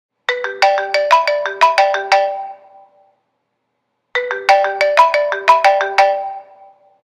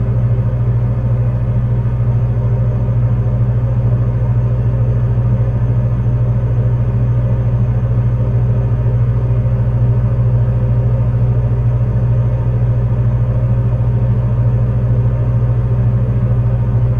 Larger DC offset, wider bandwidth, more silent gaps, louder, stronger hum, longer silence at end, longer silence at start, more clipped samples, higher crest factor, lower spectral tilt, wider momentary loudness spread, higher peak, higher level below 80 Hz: neither; first, 13.5 kHz vs 2.9 kHz; neither; about the same, -14 LUFS vs -15 LUFS; neither; first, 0.65 s vs 0 s; first, 0.3 s vs 0 s; neither; first, 16 dB vs 10 dB; second, 0 dB/octave vs -11 dB/octave; first, 11 LU vs 1 LU; about the same, 0 dBFS vs -2 dBFS; second, -62 dBFS vs -22 dBFS